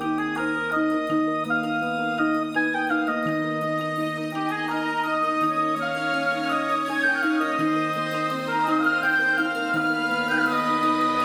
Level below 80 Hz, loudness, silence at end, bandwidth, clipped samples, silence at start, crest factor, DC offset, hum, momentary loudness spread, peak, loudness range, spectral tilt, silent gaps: -64 dBFS; -24 LUFS; 0 s; 16 kHz; under 0.1%; 0 s; 12 dB; under 0.1%; none; 5 LU; -10 dBFS; 2 LU; -5 dB/octave; none